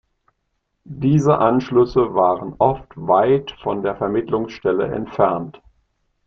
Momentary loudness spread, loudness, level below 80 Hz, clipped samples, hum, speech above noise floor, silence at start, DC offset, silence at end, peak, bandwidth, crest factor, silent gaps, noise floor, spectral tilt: 9 LU; -19 LUFS; -48 dBFS; under 0.1%; none; 54 dB; 0.9 s; under 0.1%; 0.75 s; -2 dBFS; 7.4 kHz; 18 dB; none; -72 dBFS; -8 dB/octave